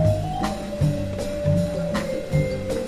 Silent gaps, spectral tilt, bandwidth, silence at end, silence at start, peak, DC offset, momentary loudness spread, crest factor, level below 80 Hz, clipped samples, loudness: none; -7 dB/octave; 14.5 kHz; 0 s; 0 s; -8 dBFS; under 0.1%; 5 LU; 14 dB; -36 dBFS; under 0.1%; -25 LUFS